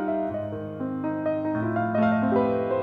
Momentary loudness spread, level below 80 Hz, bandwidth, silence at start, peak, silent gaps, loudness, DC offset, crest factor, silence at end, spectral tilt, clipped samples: 9 LU; -58 dBFS; 4.9 kHz; 0 s; -10 dBFS; none; -26 LUFS; under 0.1%; 14 dB; 0 s; -10 dB/octave; under 0.1%